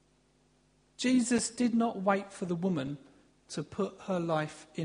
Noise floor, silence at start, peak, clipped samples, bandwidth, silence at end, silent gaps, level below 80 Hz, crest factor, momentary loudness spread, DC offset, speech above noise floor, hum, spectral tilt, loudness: -68 dBFS; 1 s; -14 dBFS; under 0.1%; 10.5 kHz; 0 s; none; -68 dBFS; 18 dB; 12 LU; under 0.1%; 37 dB; none; -5 dB/octave; -32 LUFS